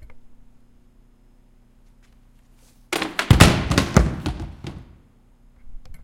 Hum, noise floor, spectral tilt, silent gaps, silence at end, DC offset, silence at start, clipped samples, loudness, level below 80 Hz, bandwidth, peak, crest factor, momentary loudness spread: 60 Hz at -45 dBFS; -53 dBFS; -5 dB/octave; none; 0 s; under 0.1%; 0.1 s; under 0.1%; -19 LUFS; -30 dBFS; 16.5 kHz; 0 dBFS; 24 dB; 24 LU